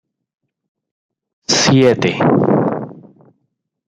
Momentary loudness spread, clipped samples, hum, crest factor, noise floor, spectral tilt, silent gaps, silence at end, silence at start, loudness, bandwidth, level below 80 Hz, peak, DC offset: 17 LU; under 0.1%; none; 16 dB; -70 dBFS; -4.5 dB/octave; none; 0.95 s; 1.5 s; -13 LUFS; 10 kHz; -56 dBFS; -2 dBFS; under 0.1%